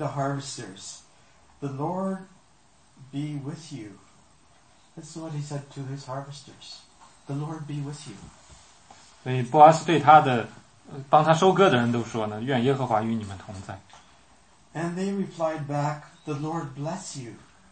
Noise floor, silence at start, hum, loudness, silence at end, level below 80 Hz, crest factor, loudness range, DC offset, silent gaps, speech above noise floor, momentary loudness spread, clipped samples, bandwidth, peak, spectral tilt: -60 dBFS; 0 s; none; -24 LUFS; 0.35 s; -66 dBFS; 24 dB; 18 LU; under 0.1%; none; 35 dB; 25 LU; under 0.1%; 8.8 kHz; -2 dBFS; -6 dB/octave